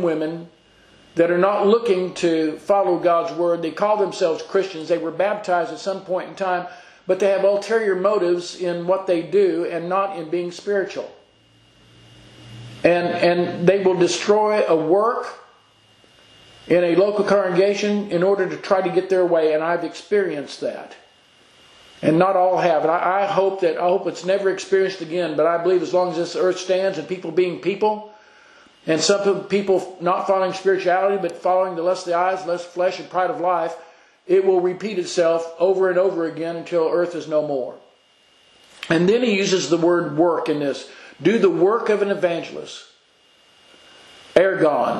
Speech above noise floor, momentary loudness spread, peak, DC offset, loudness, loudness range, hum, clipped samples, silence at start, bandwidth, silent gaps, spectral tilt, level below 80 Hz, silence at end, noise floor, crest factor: 37 dB; 9 LU; 0 dBFS; under 0.1%; -20 LUFS; 4 LU; none; under 0.1%; 0 s; 10.5 kHz; none; -5 dB/octave; -68 dBFS; 0 s; -56 dBFS; 20 dB